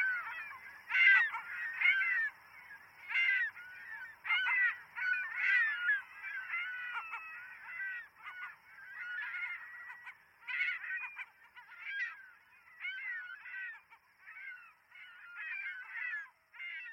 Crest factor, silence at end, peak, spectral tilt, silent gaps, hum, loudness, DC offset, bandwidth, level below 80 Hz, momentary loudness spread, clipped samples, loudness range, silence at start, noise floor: 22 dB; 0 s; -16 dBFS; 0.5 dB/octave; none; none; -34 LUFS; under 0.1%; 16.5 kHz; -88 dBFS; 21 LU; under 0.1%; 13 LU; 0 s; -63 dBFS